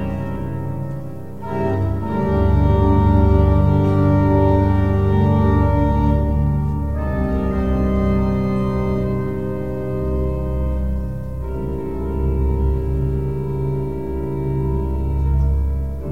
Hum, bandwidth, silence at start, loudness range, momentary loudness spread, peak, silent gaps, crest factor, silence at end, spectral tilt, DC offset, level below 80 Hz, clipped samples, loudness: none; 4.9 kHz; 0 s; 7 LU; 10 LU; -2 dBFS; none; 16 dB; 0 s; -10 dB/octave; 2%; -22 dBFS; under 0.1%; -19 LUFS